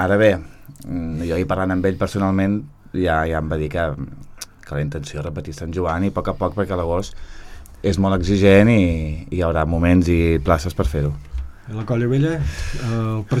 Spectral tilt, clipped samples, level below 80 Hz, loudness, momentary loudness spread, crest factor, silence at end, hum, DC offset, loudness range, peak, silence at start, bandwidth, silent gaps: -7.5 dB/octave; under 0.1%; -32 dBFS; -20 LUFS; 14 LU; 18 dB; 0 s; none; under 0.1%; 8 LU; 0 dBFS; 0 s; 14 kHz; none